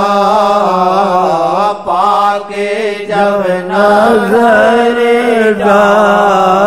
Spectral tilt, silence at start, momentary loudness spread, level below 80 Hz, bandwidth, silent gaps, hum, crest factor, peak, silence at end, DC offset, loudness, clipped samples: -5.5 dB/octave; 0 s; 6 LU; -48 dBFS; 15 kHz; none; none; 10 dB; 0 dBFS; 0 s; 0.6%; -9 LUFS; under 0.1%